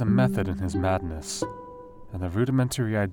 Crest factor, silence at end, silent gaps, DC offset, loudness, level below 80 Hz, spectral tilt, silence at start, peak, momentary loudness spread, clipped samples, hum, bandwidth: 16 dB; 0 s; none; under 0.1%; -27 LUFS; -48 dBFS; -6.5 dB/octave; 0 s; -10 dBFS; 17 LU; under 0.1%; none; 17.5 kHz